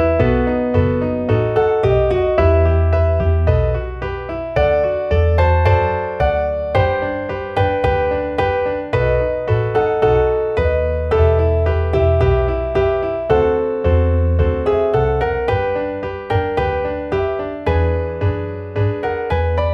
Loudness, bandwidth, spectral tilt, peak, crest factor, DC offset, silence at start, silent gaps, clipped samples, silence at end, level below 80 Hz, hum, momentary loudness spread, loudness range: -17 LUFS; 5.6 kHz; -9 dB/octave; -2 dBFS; 14 dB; under 0.1%; 0 s; none; under 0.1%; 0 s; -24 dBFS; none; 6 LU; 3 LU